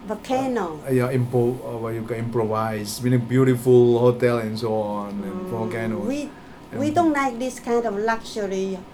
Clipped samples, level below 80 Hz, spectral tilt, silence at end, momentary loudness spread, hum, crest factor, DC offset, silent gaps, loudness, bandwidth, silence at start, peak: under 0.1%; -52 dBFS; -7 dB/octave; 0 s; 11 LU; none; 18 dB; under 0.1%; none; -22 LUFS; 15.5 kHz; 0 s; -4 dBFS